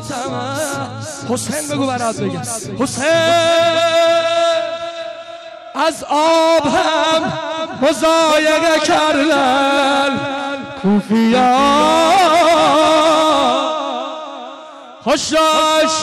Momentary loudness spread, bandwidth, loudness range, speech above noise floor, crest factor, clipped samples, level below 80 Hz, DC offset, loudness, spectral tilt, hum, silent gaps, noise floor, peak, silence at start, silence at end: 13 LU; 14.5 kHz; 4 LU; 21 dB; 8 dB; under 0.1%; -50 dBFS; under 0.1%; -14 LUFS; -3.5 dB/octave; none; none; -35 dBFS; -6 dBFS; 0 s; 0 s